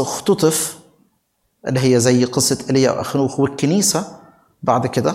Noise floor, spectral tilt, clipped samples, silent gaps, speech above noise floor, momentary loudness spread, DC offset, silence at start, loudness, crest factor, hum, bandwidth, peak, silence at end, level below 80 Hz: -67 dBFS; -4.5 dB/octave; under 0.1%; none; 50 dB; 9 LU; under 0.1%; 0 s; -17 LUFS; 18 dB; none; 16.5 kHz; 0 dBFS; 0 s; -56 dBFS